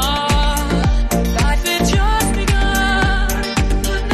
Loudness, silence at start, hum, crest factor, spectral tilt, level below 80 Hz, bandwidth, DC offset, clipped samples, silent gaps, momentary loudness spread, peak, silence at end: -17 LUFS; 0 s; none; 12 dB; -4.5 dB/octave; -18 dBFS; 13.5 kHz; under 0.1%; under 0.1%; none; 3 LU; -4 dBFS; 0 s